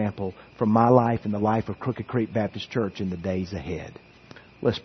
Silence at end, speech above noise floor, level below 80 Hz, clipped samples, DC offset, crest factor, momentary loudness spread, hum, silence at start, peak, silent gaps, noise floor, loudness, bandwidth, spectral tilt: 0.05 s; 24 dB; -56 dBFS; under 0.1%; under 0.1%; 22 dB; 15 LU; none; 0 s; -2 dBFS; none; -49 dBFS; -25 LUFS; 6.4 kHz; -8.5 dB/octave